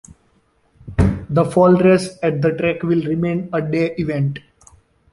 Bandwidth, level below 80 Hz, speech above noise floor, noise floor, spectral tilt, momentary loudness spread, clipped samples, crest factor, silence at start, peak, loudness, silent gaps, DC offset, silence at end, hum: 11.5 kHz; -34 dBFS; 43 dB; -60 dBFS; -8 dB/octave; 9 LU; under 0.1%; 16 dB; 0.85 s; -2 dBFS; -18 LUFS; none; under 0.1%; 0.75 s; none